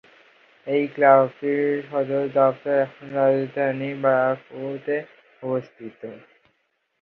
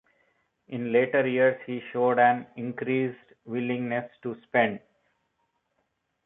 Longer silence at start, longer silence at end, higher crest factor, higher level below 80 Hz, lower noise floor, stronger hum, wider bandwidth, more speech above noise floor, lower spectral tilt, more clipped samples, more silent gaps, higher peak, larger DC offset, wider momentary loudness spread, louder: about the same, 0.65 s vs 0.7 s; second, 0.85 s vs 1.5 s; about the same, 20 dB vs 20 dB; about the same, -74 dBFS vs -76 dBFS; second, -71 dBFS vs -76 dBFS; neither; first, 4.6 kHz vs 3.9 kHz; about the same, 49 dB vs 50 dB; about the same, -9 dB/octave vs -10 dB/octave; neither; neither; first, -4 dBFS vs -8 dBFS; neither; first, 19 LU vs 14 LU; first, -22 LUFS vs -26 LUFS